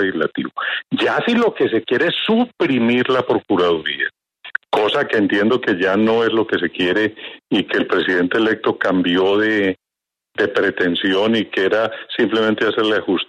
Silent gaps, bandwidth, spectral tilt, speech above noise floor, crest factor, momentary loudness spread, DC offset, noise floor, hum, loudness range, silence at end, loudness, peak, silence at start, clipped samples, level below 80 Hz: none; 9.6 kHz; -6 dB/octave; 68 dB; 14 dB; 6 LU; under 0.1%; -85 dBFS; none; 1 LU; 0.05 s; -17 LUFS; -4 dBFS; 0 s; under 0.1%; -60 dBFS